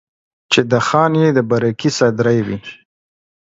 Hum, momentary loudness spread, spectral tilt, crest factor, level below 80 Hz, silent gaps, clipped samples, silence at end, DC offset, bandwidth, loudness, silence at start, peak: none; 9 LU; -5.5 dB/octave; 16 dB; -54 dBFS; none; under 0.1%; 0.7 s; under 0.1%; 8 kHz; -15 LUFS; 0.5 s; 0 dBFS